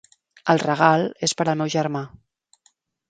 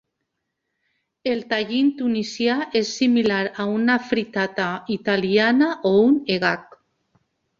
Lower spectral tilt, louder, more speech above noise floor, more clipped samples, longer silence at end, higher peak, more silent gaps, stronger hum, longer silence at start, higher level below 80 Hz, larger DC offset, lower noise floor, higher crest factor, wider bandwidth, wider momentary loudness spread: about the same, -4.5 dB/octave vs -5 dB/octave; about the same, -21 LUFS vs -21 LUFS; second, 44 dB vs 58 dB; neither; about the same, 1 s vs 0.95 s; first, 0 dBFS vs -4 dBFS; neither; neither; second, 0.45 s vs 1.25 s; about the same, -64 dBFS vs -64 dBFS; neither; second, -64 dBFS vs -78 dBFS; about the same, 22 dB vs 18 dB; first, 9.4 kHz vs 7.6 kHz; first, 12 LU vs 8 LU